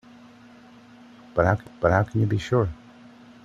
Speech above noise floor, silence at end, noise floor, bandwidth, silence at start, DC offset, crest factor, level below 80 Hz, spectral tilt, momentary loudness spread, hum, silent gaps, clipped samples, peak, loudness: 27 dB; 0.7 s; -49 dBFS; 7.8 kHz; 1.35 s; under 0.1%; 20 dB; -48 dBFS; -8 dB/octave; 8 LU; none; none; under 0.1%; -6 dBFS; -24 LUFS